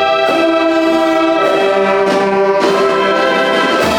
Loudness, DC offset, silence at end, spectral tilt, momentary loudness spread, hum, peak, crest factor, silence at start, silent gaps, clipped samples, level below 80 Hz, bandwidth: -12 LUFS; under 0.1%; 0 s; -4.5 dB/octave; 0 LU; none; 0 dBFS; 12 dB; 0 s; none; under 0.1%; -48 dBFS; 17.5 kHz